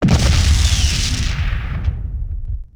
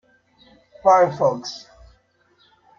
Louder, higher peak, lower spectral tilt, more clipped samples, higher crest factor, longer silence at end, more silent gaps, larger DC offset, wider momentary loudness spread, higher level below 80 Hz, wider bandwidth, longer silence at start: about the same, -18 LUFS vs -18 LUFS; about the same, -2 dBFS vs -2 dBFS; about the same, -4 dB/octave vs -5 dB/octave; neither; second, 14 dB vs 20 dB; second, 0.15 s vs 1.2 s; neither; first, 0.2% vs under 0.1%; second, 13 LU vs 18 LU; first, -18 dBFS vs -58 dBFS; first, 15 kHz vs 7.4 kHz; second, 0 s vs 0.85 s